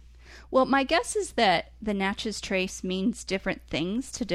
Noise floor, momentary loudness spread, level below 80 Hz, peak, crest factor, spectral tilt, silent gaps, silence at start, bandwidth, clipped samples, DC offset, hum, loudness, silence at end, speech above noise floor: -49 dBFS; 8 LU; -50 dBFS; -10 dBFS; 18 dB; -4 dB/octave; none; 0.15 s; 13.5 kHz; under 0.1%; under 0.1%; none; -27 LUFS; 0 s; 22 dB